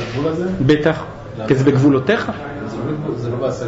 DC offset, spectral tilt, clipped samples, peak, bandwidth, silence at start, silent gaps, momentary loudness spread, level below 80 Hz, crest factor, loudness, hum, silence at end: under 0.1%; -7.5 dB/octave; under 0.1%; -4 dBFS; 8 kHz; 0 s; none; 13 LU; -42 dBFS; 14 dB; -18 LUFS; none; 0 s